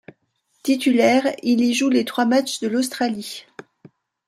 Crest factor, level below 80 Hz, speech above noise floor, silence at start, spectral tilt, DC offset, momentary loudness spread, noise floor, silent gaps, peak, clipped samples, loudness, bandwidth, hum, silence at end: 16 dB; -72 dBFS; 48 dB; 0.65 s; -3.5 dB/octave; under 0.1%; 13 LU; -67 dBFS; none; -4 dBFS; under 0.1%; -20 LUFS; 15 kHz; none; 0.85 s